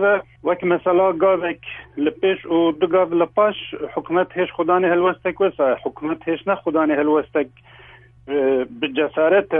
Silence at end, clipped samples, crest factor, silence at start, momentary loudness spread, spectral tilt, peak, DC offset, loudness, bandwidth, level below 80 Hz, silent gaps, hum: 0 s; under 0.1%; 16 dB; 0 s; 9 LU; -9.5 dB/octave; -4 dBFS; under 0.1%; -20 LUFS; 3.7 kHz; -56 dBFS; none; none